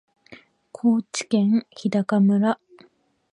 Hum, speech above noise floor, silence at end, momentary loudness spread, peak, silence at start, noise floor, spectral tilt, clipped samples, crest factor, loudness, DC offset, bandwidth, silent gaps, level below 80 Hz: none; 38 dB; 0.8 s; 5 LU; -8 dBFS; 0.3 s; -59 dBFS; -6.5 dB/octave; under 0.1%; 14 dB; -22 LUFS; under 0.1%; 10.5 kHz; none; -74 dBFS